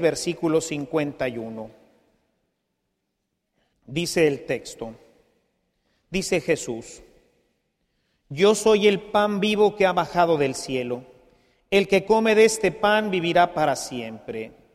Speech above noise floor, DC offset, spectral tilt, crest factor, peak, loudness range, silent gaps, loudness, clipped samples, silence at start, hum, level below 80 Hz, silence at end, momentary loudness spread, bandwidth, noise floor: 56 dB; under 0.1%; -4.5 dB/octave; 18 dB; -6 dBFS; 10 LU; none; -22 LUFS; under 0.1%; 0 s; none; -56 dBFS; 0.25 s; 16 LU; 14.5 kHz; -78 dBFS